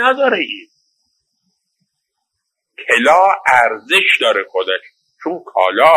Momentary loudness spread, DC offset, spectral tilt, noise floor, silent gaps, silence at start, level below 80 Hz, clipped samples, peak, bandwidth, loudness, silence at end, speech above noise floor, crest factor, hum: 14 LU; under 0.1%; -2 dB/octave; -76 dBFS; none; 0 s; -62 dBFS; under 0.1%; 0 dBFS; 16 kHz; -13 LUFS; 0 s; 62 dB; 16 dB; none